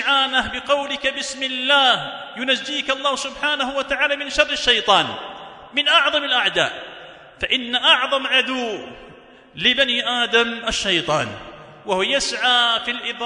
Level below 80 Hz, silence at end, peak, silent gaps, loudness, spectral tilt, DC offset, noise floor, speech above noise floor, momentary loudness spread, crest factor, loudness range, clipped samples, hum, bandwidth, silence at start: -50 dBFS; 0 s; 0 dBFS; none; -18 LUFS; -1.5 dB/octave; under 0.1%; -45 dBFS; 25 dB; 13 LU; 20 dB; 2 LU; under 0.1%; none; 11 kHz; 0 s